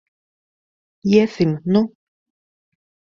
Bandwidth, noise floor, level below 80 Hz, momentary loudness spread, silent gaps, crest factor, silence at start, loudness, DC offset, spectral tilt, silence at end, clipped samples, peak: 7.2 kHz; under -90 dBFS; -58 dBFS; 10 LU; none; 20 dB; 1.05 s; -18 LUFS; under 0.1%; -7.5 dB/octave; 1.3 s; under 0.1%; -2 dBFS